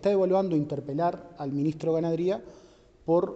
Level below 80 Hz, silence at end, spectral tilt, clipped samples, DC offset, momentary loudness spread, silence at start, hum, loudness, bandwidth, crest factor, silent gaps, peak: -62 dBFS; 0 s; -8.5 dB/octave; under 0.1%; under 0.1%; 10 LU; 0 s; none; -28 LUFS; 8 kHz; 14 dB; none; -14 dBFS